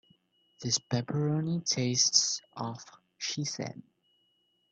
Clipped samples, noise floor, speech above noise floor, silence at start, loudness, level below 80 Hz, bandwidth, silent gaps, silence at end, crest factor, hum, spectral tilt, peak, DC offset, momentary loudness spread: under 0.1%; -73 dBFS; 42 dB; 0.6 s; -30 LUFS; -70 dBFS; 8.8 kHz; none; 0.9 s; 24 dB; 60 Hz at -60 dBFS; -3 dB/octave; -8 dBFS; under 0.1%; 17 LU